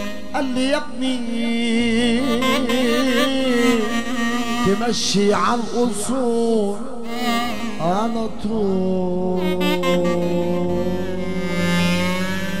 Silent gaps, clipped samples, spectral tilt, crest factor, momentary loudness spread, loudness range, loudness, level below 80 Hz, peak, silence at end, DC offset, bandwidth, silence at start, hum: none; under 0.1%; -5 dB/octave; 14 dB; 6 LU; 3 LU; -20 LUFS; -44 dBFS; -4 dBFS; 0 s; 5%; 16 kHz; 0 s; none